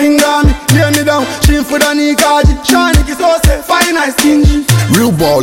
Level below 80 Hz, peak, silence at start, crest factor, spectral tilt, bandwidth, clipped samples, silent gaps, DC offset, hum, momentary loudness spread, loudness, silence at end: -16 dBFS; 0 dBFS; 0 s; 8 dB; -4.5 dB/octave; 17 kHz; under 0.1%; none; under 0.1%; none; 3 LU; -9 LUFS; 0 s